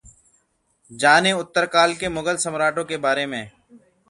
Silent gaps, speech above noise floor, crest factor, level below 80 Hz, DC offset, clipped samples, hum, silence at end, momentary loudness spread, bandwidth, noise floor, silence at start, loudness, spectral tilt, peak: none; 46 dB; 22 dB; -56 dBFS; under 0.1%; under 0.1%; none; 0.6 s; 10 LU; 11.5 kHz; -66 dBFS; 0.9 s; -20 LUFS; -3 dB/octave; 0 dBFS